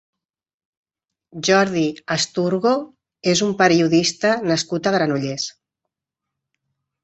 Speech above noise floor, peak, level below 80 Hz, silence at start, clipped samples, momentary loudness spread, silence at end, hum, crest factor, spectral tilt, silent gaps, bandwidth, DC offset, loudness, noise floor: 65 dB; -2 dBFS; -60 dBFS; 1.35 s; under 0.1%; 9 LU; 1.55 s; none; 20 dB; -4 dB/octave; none; 8.2 kHz; under 0.1%; -19 LUFS; -84 dBFS